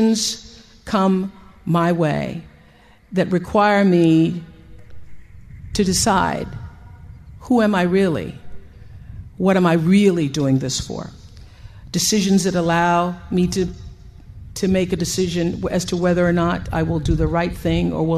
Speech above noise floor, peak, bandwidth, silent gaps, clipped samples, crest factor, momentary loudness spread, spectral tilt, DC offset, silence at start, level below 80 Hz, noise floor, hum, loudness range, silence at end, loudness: 31 dB; -2 dBFS; 14 kHz; none; under 0.1%; 16 dB; 17 LU; -5.5 dB/octave; under 0.1%; 0 s; -38 dBFS; -49 dBFS; none; 3 LU; 0 s; -19 LUFS